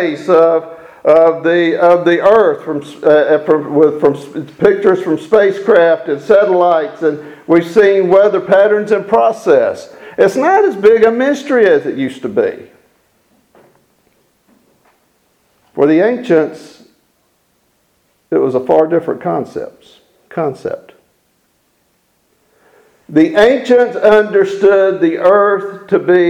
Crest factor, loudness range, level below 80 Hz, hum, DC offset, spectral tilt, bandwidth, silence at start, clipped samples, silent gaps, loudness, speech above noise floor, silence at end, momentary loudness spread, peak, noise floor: 12 dB; 10 LU; -56 dBFS; none; under 0.1%; -6.5 dB/octave; 11 kHz; 0 s; 0.2%; none; -11 LUFS; 48 dB; 0 s; 11 LU; 0 dBFS; -59 dBFS